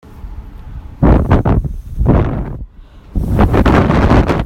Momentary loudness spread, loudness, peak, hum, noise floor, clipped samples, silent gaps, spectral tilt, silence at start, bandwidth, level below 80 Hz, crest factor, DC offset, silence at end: 22 LU; -13 LUFS; 0 dBFS; none; -37 dBFS; under 0.1%; none; -8.5 dB/octave; 0.05 s; 9.8 kHz; -18 dBFS; 12 dB; under 0.1%; 0 s